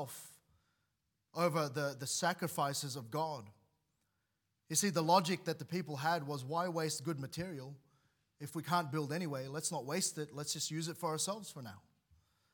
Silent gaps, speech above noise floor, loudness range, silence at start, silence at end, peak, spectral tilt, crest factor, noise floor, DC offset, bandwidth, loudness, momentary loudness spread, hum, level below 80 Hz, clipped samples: none; 47 dB; 4 LU; 0 s; 0.75 s; -16 dBFS; -4 dB/octave; 24 dB; -84 dBFS; under 0.1%; 18 kHz; -37 LUFS; 14 LU; none; -80 dBFS; under 0.1%